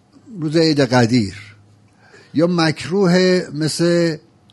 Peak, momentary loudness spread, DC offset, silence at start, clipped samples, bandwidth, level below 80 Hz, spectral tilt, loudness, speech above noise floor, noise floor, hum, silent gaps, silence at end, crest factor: 0 dBFS; 13 LU; under 0.1%; 0.3 s; under 0.1%; 11.5 kHz; -54 dBFS; -5.5 dB/octave; -17 LUFS; 34 dB; -50 dBFS; none; none; 0.35 s; 18 dB